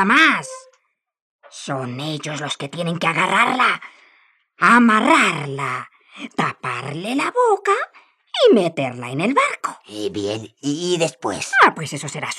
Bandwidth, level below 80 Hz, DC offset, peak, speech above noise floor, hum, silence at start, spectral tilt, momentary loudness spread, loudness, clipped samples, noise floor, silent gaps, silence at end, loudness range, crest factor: 13.5 kHz; -72 dBFS; under 0.1%; -2 dBFS; 46 dB; none; 0 s; -4 dB/octave; 15 LU; -18 LUFS; under 0.1%; -64 dBFS; 1.21-1.39 s; 0 s; 4 LU; 18 dB